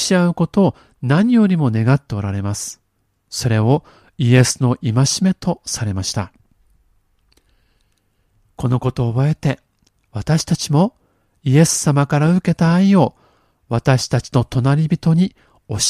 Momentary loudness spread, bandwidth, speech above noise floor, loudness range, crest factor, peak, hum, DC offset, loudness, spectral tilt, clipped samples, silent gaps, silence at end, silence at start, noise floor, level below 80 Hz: 10 LU; 14.5 kHz; 47 dB; 8 LU; 18 dB; 0 dBFS; none; under 0.1%; -17 LUFS; -5.5 dB/octave; under 0.1%; none; 0 s; 0 s; -63 dBFS; -46 dBFS